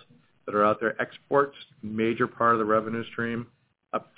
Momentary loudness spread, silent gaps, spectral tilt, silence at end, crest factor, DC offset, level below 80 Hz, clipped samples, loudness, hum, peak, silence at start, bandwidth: 13 LU; none; -10 dB/octave; 0.15 s; 18 dB; under 0.1%; -66 dBFS; under 0.1%; -27 LUFS; none; -8 dBFS; 0.45 s; 4 kHz